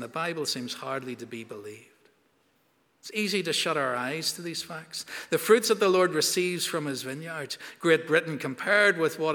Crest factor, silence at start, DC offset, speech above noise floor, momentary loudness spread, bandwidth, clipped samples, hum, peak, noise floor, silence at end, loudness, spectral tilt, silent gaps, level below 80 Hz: 20 dB; 0 s; under 0.1%; 41 dB; 15 LU; 19.5 kHz; under 0.1%; none; -8 dBFS; -68 dBFS; 0 s; -27 LUFS; -3 dB/octave; none; -82 dBFS